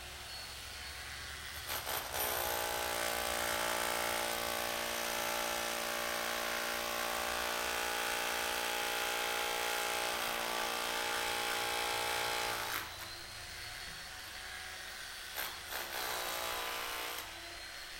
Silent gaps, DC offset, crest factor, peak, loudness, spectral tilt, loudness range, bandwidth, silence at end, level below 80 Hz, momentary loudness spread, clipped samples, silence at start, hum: none; under 0.1%; 18 dB; -20 dBFS; -36 LUFS; -0.5 dB/octave; 6 LU; 17 kHz; 0 s; -60 dBFS; 10 LU; under 0.1%; 0 s; none